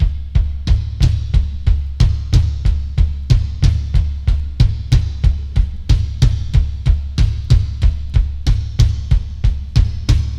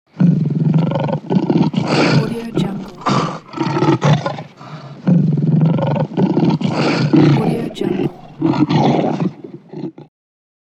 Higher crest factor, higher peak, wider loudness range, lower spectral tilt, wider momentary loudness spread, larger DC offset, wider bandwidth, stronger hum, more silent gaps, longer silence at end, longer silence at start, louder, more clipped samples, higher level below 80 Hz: about the same, 14 dB vs 16 dB; about the same, 0 dBFS vs 0 dBFS; about the same, 1 LU vs 3 LU; about the same, -6.5 dB/octave vs -7.5 dB/octave; second, 4 LU vs 13 LU; neither; about the same, 8.6 kHz vs 8.6 kHz; neither; neither; second, 0 s vs 0.7 s; second, 0 s vs 0.15 s; about the same, -18 LUFS vs -16 LUFS; neither; first, -16 dBFS vs -56 dBFS